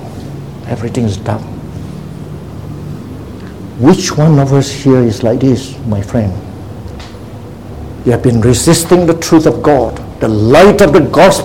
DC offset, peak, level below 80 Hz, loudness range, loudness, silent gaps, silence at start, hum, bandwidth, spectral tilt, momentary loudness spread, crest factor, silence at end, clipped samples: 0.8%; 0 dBFS; -32 dBFS; 11 LU; -10 LUFS; none; 0 s; none; 17 kHz; -6 dB/octave; 20 LU; 10 dB; 0 s; 0.9%